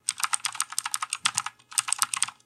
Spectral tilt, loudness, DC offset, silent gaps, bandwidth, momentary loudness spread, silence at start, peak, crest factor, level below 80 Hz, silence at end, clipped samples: 3 dB/octave; -27 LUFS; under 0.1%; none; 16 kHz; 5 LU; 0.1 s; -2 dBFS; 28 dB; -76 dBFS; 0.15 s; under 0.1%